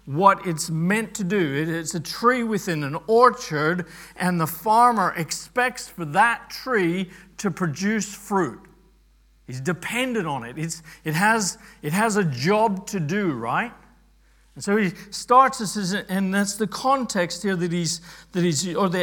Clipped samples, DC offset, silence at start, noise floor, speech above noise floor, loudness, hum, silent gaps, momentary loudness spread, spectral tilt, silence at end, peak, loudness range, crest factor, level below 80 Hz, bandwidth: under 0.1%; under 0.1%; 0.05 s; -57 dBFS; 34 dB; -23 LUFS; none; none; 11 LU; -4.5 dB/octave; 0 s; -2 dBFS; 6 LU; 22 dB; -58 dBFS; 18 kHz